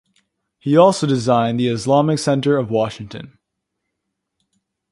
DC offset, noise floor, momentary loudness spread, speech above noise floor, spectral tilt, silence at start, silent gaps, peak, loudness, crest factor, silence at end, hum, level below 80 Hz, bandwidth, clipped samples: under 0.1%; -77 dBFS; 16 LU; 61 dB; -6 dB/octave; 0.65 s; none; 0 dBFS; -17 LUFS; 18 dB; 1.65 s; none; -58 dBFS; 11.5 kHz; under 0.1%